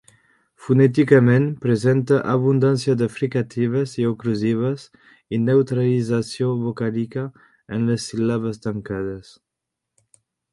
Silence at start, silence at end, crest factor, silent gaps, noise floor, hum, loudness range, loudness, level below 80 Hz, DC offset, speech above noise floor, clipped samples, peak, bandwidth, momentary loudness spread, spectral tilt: 0.6 s; 1.3 s; 20 dB; none; -83 dBFS; none; 8 LU; -20 LUFS; -56 dBFS; under 0.1%; 63 dB; under 0.1%; -2 dBFS; 11.5 kHz; 12 LU; -7.5 dB/octave